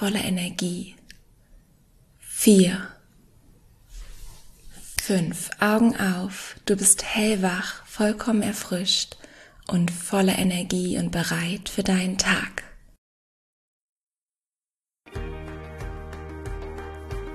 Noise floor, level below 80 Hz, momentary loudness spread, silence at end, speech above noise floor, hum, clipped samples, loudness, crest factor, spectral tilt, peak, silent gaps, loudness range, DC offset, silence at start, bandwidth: under -90 dBFS; -44 dBFS; 19 LU; 0 s; over 67 dB; none; under 0.1%; -23 LUFS; 22 dB; -4 dB/octave; -4 dBFS; 12.98-13.96 s, 14.03-14.07 s; 17 LU; under 0.1%; 0 s; 13.5 kHz